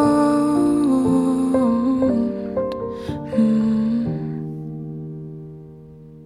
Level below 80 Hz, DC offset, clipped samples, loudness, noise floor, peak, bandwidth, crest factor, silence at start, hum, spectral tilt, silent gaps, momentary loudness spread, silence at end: -48 dBFS; under 0.1%; under 0.1%; -20 LUFS; -41 dBFS; -6 dBFS; 12 kHz; 14 dB; 0 s; none; -8 dB/octave; none; 15 LU; 0 s